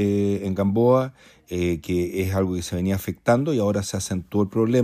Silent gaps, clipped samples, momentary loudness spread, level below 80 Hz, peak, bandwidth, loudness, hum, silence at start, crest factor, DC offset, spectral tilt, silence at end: none; under 0.1%; 7 LU; -48 dBFS; -6 dBFS; 15.5 kHz; -23 LUFS; none; 0 s; 16 dB; under 0.1%; -6.5 dB/octave; 0 s